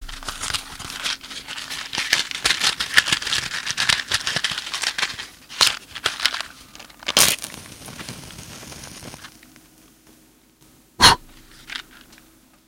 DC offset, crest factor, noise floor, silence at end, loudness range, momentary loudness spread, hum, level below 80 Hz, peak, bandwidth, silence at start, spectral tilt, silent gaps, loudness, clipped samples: under 0.1%; 24 dB; -54 dBFS; 0.55 s; 4 LU; 21 LU; none; -46 dBFS; 0 dBFS; 17 kHz; 0 s; 0 dB/octave; none; -20 LUFS; under 0.1%